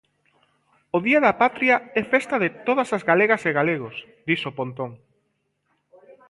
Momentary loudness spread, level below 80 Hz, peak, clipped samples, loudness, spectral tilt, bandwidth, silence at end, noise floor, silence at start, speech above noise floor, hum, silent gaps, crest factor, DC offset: 12 LU; -66 dBFS; -4 dBFS; under 0.1%; -21 LUFS; -6 dB/octave; 11.5 kHz; 0.15 s; -72 dBFS; 0.95 s; 51 dB; none; none; 20 dB; under 0.1%